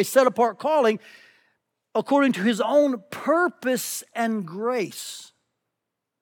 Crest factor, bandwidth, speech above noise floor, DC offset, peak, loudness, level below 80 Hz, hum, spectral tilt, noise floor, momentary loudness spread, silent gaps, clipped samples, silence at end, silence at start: 20 dB; 19.5 kHz; 60 dB; under 0.1%; -4 dBFS; -23 LUFS; -82 dBFS; none; -4 dB/octave; -83 dBFS; 10 LU; none; under 0.1%; 0.95 s; 0 s